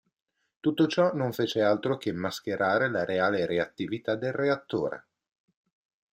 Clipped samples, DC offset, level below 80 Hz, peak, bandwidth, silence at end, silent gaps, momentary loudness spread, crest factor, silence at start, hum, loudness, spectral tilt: under 0.1%; under 0.1%; -70 dBFS; -10 dBFS; 16 kHz; 1.15 s; none; 7 LU; 18 dB; 0.65 s; none; -28 LUFS; -6 dB/octave